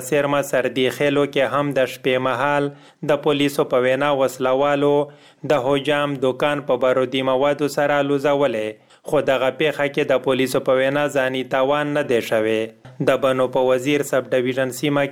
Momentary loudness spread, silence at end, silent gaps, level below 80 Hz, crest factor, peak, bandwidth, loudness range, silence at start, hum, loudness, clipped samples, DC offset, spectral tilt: 4 LU; 0 s; none; -58 dBFS; 16 dB; -2 dBFS; 17 kHz; 1 LU; 0 s; none; -19 LUFS; under 0.1%; under 0.1%; -5 dB/octave